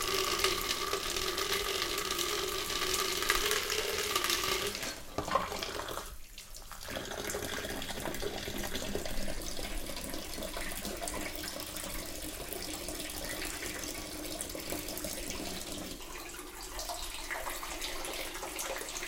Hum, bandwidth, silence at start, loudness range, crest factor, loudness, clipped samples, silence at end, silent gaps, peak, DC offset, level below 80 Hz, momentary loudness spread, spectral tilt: none; 17 kHz; 0 s; 8 LU; 26 dB; -35 LUFS; under 0.1%; 0 s; none; -10 dBFS; under 0.1%; -48 dBFS; 10 LU; -1.5 dB/octave